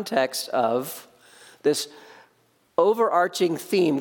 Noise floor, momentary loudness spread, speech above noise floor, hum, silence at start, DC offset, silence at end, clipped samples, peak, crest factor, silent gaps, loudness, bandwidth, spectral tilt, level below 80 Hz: -64 dBFS; 10 LU; 41 dB; none; 0 s; under 0.1%; 0 s; under 0.1%; -4 dBFS; 20 dB; none; -23 LUFS; 17.5 kHz; -4 dB/octave; -76 dBFS